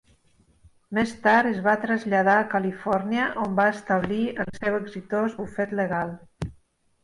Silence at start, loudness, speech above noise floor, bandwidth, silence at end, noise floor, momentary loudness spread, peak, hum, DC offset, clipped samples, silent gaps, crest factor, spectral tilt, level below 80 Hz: 0.9 s; -24 LUFS; 38 dB; 11.5 kHz; 0.5 s; -61 dBFS; 10 LU; -8 dBFS; none; under 0.1%; under 0.1%; none; 16 dB; -6.5 dB/octave; -54 dBFS